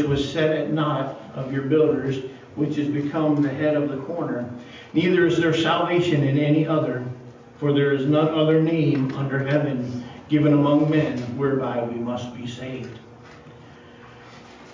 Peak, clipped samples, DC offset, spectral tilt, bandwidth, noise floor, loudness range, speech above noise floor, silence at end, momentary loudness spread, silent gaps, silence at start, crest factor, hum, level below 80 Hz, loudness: -6 dBFS; under 0.1%; under 0.1%; -7.5 dB/octave; 7.6 kHz; -45 dBFS; 4 LU; 23 dB; 0 s; 14 LU; none; 0 s; 16 dB; none; -56 dBFS; -22 LUFS